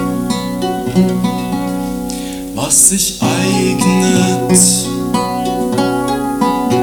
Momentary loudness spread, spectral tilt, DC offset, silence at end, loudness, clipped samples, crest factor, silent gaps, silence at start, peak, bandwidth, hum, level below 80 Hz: 11 LU; -4 dB/octave; under 0.1%; 0 s; -13 LUFS; under 0.1%; 14 dB; none; 0 s; 0 dBFS; 19 kHz; none; -38 dBFS